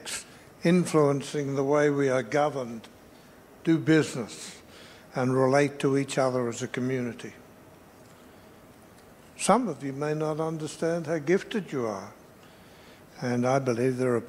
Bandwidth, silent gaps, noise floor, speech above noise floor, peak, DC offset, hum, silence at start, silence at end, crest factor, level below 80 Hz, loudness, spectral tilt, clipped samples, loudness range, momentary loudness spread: 16 kHz; none; -52 dBFS; 26 dB; -6 dBFS; under 0.1%; none; 0 s; 0 s; 22 dB; -68 dBFS; -27 LUFS; -6 dB/octave; under 0.1%; 5 LU; 15 LU